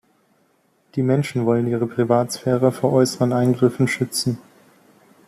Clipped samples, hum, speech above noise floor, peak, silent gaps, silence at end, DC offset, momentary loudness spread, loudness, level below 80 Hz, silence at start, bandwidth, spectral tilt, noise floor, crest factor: under 0.1%; none; 43 dB; -4 dBFS; none; 0.9 s; under 0.1%; 6 LU; -20 LUFS; -60 dBFS; 0.95 s; 15 kHz; -6 dB/octave; -62 dBFS; 18 dB